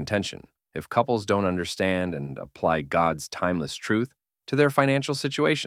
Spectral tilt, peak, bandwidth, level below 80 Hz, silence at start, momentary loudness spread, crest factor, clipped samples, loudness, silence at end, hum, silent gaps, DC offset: -5.5 dB/octave; -4 dBFS; 15.5 kHz; -56 dBFS; 0 s; 12 LU; 20 dB; under 0.1%; -25 LUFS; 0 s; none; none; under 0.1%